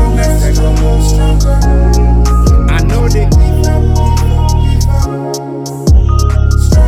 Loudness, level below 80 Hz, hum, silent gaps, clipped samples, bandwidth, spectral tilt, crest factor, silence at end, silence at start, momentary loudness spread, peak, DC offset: -11 LUFS; -10 dBFS; none; none; under 0.1%; 14.5 kHz; -6.5 dB/octave; 8 dB; 0 s; 0 s; 4 LU; 0 dBFS; under 0.1%